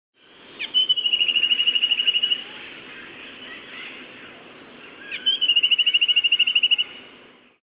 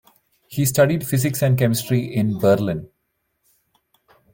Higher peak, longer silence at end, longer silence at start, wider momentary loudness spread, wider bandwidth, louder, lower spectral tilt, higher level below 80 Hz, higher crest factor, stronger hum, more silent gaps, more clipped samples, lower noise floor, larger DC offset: second, -8 dBFS vs -4 dBFS; second, 0.6 s vs 1.45 s; about the same, 0.5 s vs 0.5 s; first, 22 LU vs 7 LU; second, 4 kHz vs 17 kHz; first, -17 LUFS vs -20 LUFS; second, 4.5 dB/octave vs -6 dB/octave; second, -72 dBFS vs -54 dBFS; about the same, 14 dB vs 18 dB; neither; neither; neither; second, -50 dBFS vs -72 dBFS; neither